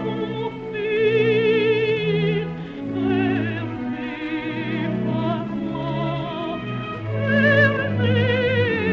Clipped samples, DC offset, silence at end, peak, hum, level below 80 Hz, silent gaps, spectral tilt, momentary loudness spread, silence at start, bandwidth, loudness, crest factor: under 0.1%; under 0.1%; 0 s; -4 dBFS; none; -50 dBFS; none; -5 dB/octave; 10 LU; 0 s; 6.6 kHz; -22 LUFS; 16 dB